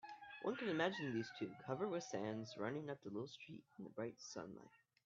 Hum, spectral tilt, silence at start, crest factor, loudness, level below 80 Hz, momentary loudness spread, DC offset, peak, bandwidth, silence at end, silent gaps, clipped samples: none; -4.5 dB/octave; 0.05 s; 20 dB; -46 LUFS; -86 dBFS; 15 LU; under 0.1%; -26 dBFS; 7.4 kHz; 0.3 s; none; under 0.1%